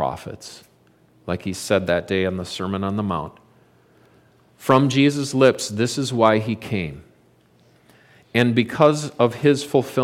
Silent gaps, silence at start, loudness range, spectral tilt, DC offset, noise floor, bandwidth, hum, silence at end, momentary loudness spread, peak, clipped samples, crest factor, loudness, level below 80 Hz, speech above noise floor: none; 0 s; 5 LU; -5.5 dB/octave; under 0.1%; -56 dBFS; 16 kHz; none; 0 s; 12 LU; -2 dBFS; under 0.1%; 20 dB; -20 LUFS; -56 dBFS; 36 dB